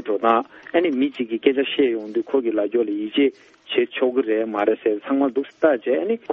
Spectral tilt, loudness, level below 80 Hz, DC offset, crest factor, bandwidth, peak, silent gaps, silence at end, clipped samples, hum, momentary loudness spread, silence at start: -6.5 dB/octave; -21 LUFS; -70 dBFS; under 0.1%; 18 dB; 5.8 kHz; -2 dBFS; none; 0 s; under 0.1%; none; 3 LU; 0 s